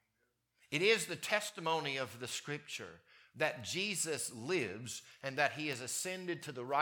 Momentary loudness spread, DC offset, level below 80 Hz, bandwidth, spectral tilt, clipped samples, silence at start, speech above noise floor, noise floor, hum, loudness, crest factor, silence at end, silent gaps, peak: 10 LU; under 0.1%; -84 dBFS; 19 kHz; -2.5 dB/octave; under 0.1%; 0.7 s; 44 dB; -82 dBFS; none; -37 LUFS; 24 dB; 0 s; none; -16 dBFS